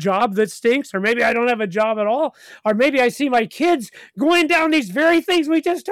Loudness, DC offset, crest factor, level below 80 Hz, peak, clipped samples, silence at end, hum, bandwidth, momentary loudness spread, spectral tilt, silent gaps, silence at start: -18 LUFS; under 0.1%; 12 dB; -62 dBFS; -6 dBFS; under 0.1%; 0 s; none; 15 kHz; 7 LU; -4.5 dB/octave; none; 0 s